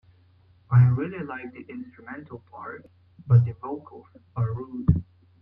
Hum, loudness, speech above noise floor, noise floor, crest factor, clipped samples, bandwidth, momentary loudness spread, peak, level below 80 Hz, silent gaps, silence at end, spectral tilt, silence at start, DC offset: none; -24 LUFS; 33 dB; -58 dBFS; 22 dB; under 0.1%; 3 kHz; 20 LU; -4 dBFS; -48 dBFS; none; 0.4 s; -12 dB/octave; 0.7 s; under 0.1%